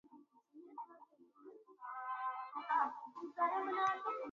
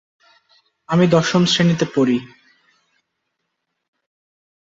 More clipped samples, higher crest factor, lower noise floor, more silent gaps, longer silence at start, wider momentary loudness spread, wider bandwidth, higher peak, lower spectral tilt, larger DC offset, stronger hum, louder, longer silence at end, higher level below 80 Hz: neither; about the same, 18 dB vs 18 dB; second, -65 dBFS vs -75 dBFS; neither; second, 0.1 s vs 0.9 s; first, 23 LU vs 6 LU; about the same, 7.4 kHz vs 8 kHz; second, -24 dBFS vs -2 dBFS; second, -0.5 dB/octave vs -5.5 dB/octave; neither; neither; second, -40 LUFS vs -17 LUFS; second, 0 s vs 2.45 s; second, under -90 dBFS vs -58 dBFS